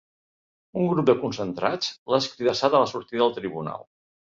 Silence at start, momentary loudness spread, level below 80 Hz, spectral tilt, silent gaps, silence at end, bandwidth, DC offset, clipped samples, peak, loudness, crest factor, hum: 0.75 s; 12 LU; -64 dBFS; -5.5 dB/octave; 1.98-2.06 s; 0.5 s; 7.6 kHz; under 0.1%; under 0.1%; -6 dBFS; -24 LUFS; 20 dB; none